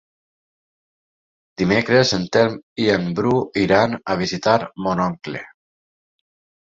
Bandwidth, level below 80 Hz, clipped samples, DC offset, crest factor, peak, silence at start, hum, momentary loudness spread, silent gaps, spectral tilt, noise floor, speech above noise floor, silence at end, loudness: 7.8 kHz; -52 dBFS; under 0.1%; under 0.1%; 20 dB; -2 dBFS; 1.6 s; none; 8 LU; 2.63-2.76 s; -5.5 dB/octave; under -90 dBFS; over 71 dB; 1.2 s; -19 LUFS